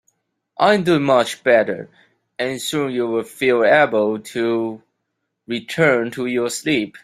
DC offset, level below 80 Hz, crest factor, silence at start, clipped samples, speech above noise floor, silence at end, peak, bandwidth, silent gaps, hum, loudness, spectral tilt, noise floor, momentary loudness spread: under 0.1%; -62 dBFS; 18 dB; 0.6 s; under 0.1%; 57 dB; 0.05 s; -2 dBFS; 15.5 kHz; none; none; -18 LUFS; -4.5 dB/octave; -75 dBFS; 13 LU